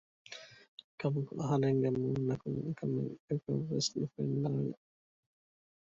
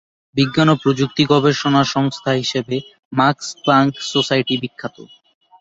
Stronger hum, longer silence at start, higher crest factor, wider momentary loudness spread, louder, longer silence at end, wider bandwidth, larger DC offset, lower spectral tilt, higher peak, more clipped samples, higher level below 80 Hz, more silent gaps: neither; about the same, 0.3 s vs 0.35 s; about the same, 16 dB vs 16 dB; first, 19 LU vs 11 LU; second, -35 LUFS vs -17 LUFS; first, 1.15 s vs 0.55 s; about the same, 7.8 kHz vs 8 kHz; neither; about the same, -6.5 dB/octave vs -5.5 dB/octave; second, -20 dBFS vs -2 dBFS; neither; second, -68 dBFS vs -56 dBFS; first, 0.68-0.77 s, 0.84-0.98 s, 3.20-3.28 s vs 2.99-3.11 s